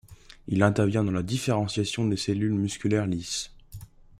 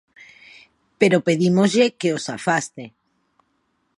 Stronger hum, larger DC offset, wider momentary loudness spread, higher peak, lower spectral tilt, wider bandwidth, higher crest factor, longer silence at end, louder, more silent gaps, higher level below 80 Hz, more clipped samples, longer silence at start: neither; neither; first, 19 LU vs 16 LU; second, -6 dBFS vs -2 dBFS; about the same, -5.5 dB/octave vs -5.5 dB/octave; first, 14.5 kHz vs 11.5 kHz; about the same, 20 dB vs 20 dB; second, 0.35 s vs 1.1 s; second, -26 LUFS vs -19 LUFS; neither; first, -54 dBFS vs -68 dBFS; neither; second, 0.1 s vs 1 s